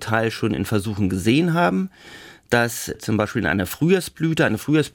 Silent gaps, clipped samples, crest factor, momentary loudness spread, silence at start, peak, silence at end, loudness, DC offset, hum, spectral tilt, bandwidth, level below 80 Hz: none; under 0.1%; 18 dB; 7 LU; 0 s; -4 dBFS; 0.05 s; -21 LUFS; under 0.1%; none; -5.5 dB/octave; 18 kHz; -52 dBFS